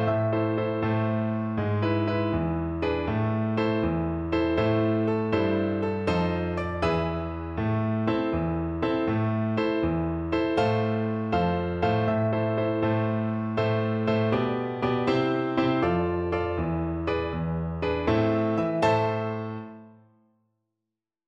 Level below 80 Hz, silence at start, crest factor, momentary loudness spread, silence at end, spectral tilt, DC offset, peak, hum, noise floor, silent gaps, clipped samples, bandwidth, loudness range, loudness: -44 dBFS; 0 s; 16 dB; 4 LU; 1.4 s; -8.5 dB/octave; under 0.1%; -10 dBFS; none; -87 dBFS; none; under 0.1%; 7.4 kHz; 2 LU; -26 LUFS